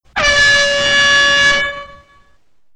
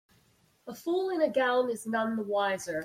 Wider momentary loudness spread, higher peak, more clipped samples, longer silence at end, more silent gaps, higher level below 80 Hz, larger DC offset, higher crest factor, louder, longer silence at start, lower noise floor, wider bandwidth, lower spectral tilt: second, 9 LU vs 12 LU; first, -2 dBFS vs -16 dBFS; neither; first, 0.85 s vs 0 s; neither; first, -36 dBFS vs -74 dBFS; neither; about the same, 12 dB vs 16 dB; first, -10 LUFS vs -29 LUFS; second, 0.15 s vs 0.65 s; second, -55 dBFS vs -67 dBFS; second, 10 kHz vs 16 kHz; second, -0.5 dB/octave vs -4 dB/octave